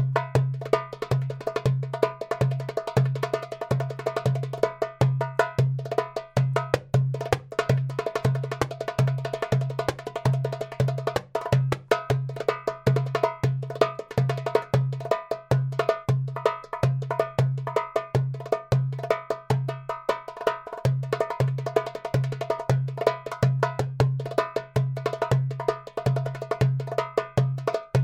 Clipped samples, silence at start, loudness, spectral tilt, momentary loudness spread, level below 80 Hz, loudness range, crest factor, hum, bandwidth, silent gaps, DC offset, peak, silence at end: under 0.1%; 0 s; -27 LUFS; -7 dB/octave; 4 LU; -52 dBFS; 2 LU; 22 dB; none; 13 kHz; none; under 0.1%; -4 dBFS; 0 s